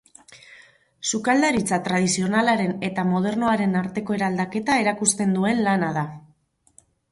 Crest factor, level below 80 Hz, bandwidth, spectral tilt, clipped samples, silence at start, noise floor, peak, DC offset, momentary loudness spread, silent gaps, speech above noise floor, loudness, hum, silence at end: 18 dB; -58 dBFS; 11.5 kHz; -4.5 dB/octave; under 0.1%; 0.3 s; -61 dBFS; -4 dBFS; under 0.1%; 6 LU; none; 40 dB; -22 LUFS; none; 0.9 s